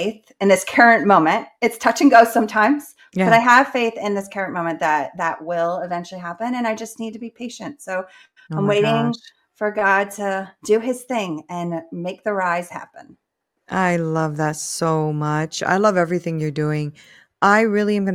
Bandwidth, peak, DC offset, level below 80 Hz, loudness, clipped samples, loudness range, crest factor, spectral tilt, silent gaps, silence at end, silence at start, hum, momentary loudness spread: 16 kHz; 0 dBFS; under 0.1%; -64 dBFS; -19 LUFS; under 0.1%; 9 LU; 18 dB; -5 dB/octave; none; 0 s; 0 s; none; 16 LU